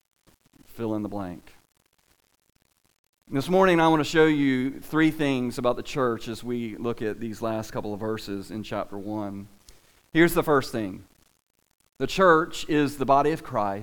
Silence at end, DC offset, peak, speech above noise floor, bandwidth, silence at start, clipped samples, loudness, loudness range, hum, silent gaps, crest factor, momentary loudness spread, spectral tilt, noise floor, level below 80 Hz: 0 s; under 0.1%; -6 dBFS; 34 dB; 19.5 kHz; 0.7 s; under 0.1%; -25 LUFS; 9 LU; none; 2.99-3.13 s; 20 dB; 13 LU; -6 dB/octave; -58 dBFS; -50 dBFS